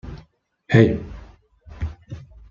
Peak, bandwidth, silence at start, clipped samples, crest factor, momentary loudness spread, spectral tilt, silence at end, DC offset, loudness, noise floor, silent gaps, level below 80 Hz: -2 dBFS; 7.2 kHz; 0.05 s; under 0.1%; 22 dB; 25 LU; -8.5 dB/octave; 0.3 s; under 0.1%; -20 LUFS; -54 dBFS; none; -40 dBFS